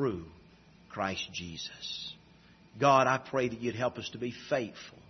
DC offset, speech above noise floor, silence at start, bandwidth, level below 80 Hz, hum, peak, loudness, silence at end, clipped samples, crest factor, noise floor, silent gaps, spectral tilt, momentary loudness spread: under 0.1%; 27 dB; 0 s; 6.2 kHz; -66 dBFS; none; -12 dBFS; -32 LUFS; 0.1 s; under 0.1%; 22 dB; -59 dBFS; none; -3.5 dB/octave; 18 LU